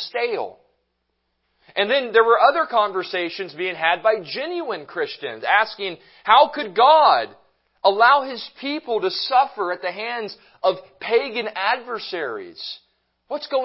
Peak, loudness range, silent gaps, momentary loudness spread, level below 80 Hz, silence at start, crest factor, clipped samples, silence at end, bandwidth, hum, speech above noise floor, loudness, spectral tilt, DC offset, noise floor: 0 dBFS; 7 LU; none; 15 LU; -74 dBFS; 0 s; 20 dB; under 0.1%; 0 s; 5.8 kHz; none; 53 dB; -20 LUFS; -7 dB/octave; under 0.1%; -73 dBFS